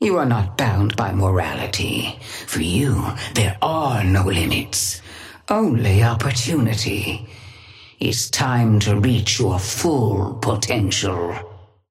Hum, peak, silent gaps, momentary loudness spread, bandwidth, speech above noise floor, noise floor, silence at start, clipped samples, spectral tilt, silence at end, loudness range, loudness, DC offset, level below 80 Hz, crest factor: none; -4 dBFS; none; 9 LU; 16 kHz; 24 dB; -43 dBFS; 0 s; under 0.1%; -5 dB/octave; 0.25 s; 2 LU; -19 LUFS; under 0.1%; -42 dBFS; 16 dB